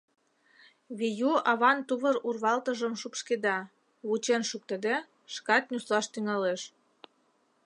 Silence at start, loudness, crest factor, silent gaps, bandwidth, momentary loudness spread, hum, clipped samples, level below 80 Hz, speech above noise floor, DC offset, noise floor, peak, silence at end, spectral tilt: 0.9 s; -29 LUFS; 22 dB; none; 11.5 kHz; 13 LU; none; under 0.1%; -86 dBFS; 41 dB; under 0.1%; -70 dBFS; -10 dBFS; 1 s; -3.5 dB/octave